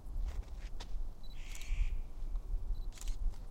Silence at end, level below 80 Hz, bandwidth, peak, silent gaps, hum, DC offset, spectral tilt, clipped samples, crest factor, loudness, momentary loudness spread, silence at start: 0 s; -38 dBFS; 12.5 kHz; -22 dBFS; none; none; under 0.1%; -4.5 dB/octave; under 0.1%; 14 dB; -46 LUFS; 8 LU; 0 s